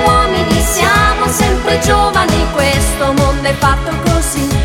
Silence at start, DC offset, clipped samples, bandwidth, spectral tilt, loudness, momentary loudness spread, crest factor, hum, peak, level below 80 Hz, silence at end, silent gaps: 0 s; under 0.1%; under 0.1%; 17.5 kHz; -4 dB/octave; -12 LUFS; 3 LU; 12 dB; none; 0 dBFS; -20 dBFS; 0 s; none